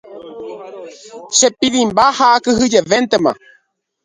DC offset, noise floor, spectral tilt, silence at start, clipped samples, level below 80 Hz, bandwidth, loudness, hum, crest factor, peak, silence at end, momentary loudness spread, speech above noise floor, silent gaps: under 0.1%; -59 dBFS; -2.5 dB/octave; 0.1 s; under 0.1%; -50 dBFS; 10 kHz; -13 LUFS; none; 16 dB; 0 dBFS; 0.7 s; 22 LU; 45 dB; none